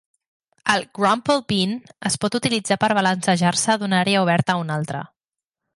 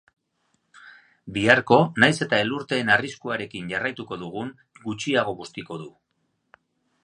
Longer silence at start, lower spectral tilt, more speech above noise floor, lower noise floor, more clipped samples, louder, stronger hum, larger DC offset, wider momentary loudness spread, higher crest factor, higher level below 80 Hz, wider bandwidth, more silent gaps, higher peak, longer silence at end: second, 0.65 s vs 0.85 s; about the same, -4 dB/octave vs -5 dB/octave; first, 68 dB vs 50 dB; first, -88 dBFS vs -73 dBFS; neither; about the same, -20 LUFS vs -22 LUFS; neither; neither; second, 8 LU vs 18 LU; second, 16 dB vs 24 dB; about the same, -60 dBFS vs -62 dBFS; about the same, 11.5 kHz vs 11 kHz; neither; second, -4 dBFS vs 0 dBFS; second, 0.7 s vs 1.15 s